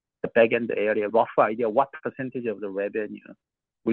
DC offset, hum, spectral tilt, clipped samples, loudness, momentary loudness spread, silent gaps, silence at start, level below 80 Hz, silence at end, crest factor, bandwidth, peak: under 0.1%; none; -9 dB/octave; under 0.1%; -25 LUFS; 11 LU; none; 0.25 s; -72 dBFS; 0 s; 20 dB; 4.2 kHz; -6 dBFS